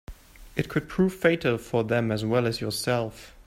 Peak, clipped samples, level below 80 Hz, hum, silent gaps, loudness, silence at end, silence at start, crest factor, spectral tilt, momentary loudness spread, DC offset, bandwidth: -6 dBFS; under 0.1%; -50 dBFS; none; none; -26 LUFS; 0.05 s; 0.1 s; 20 dB; -6 dB/octave; 7 LU; under 0.1%; 16 kHz